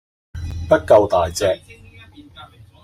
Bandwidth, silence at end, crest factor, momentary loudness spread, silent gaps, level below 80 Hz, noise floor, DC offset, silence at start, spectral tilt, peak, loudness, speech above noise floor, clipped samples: 14 kHz; 0.4 s; 18 dB; 19 LU; none; -42 dBFS; -43 dBFS; under 0.1%; 0.35 s; -5 dB/octave; -2 dBFS; -17 LUFS; 28 dB; under 0.1%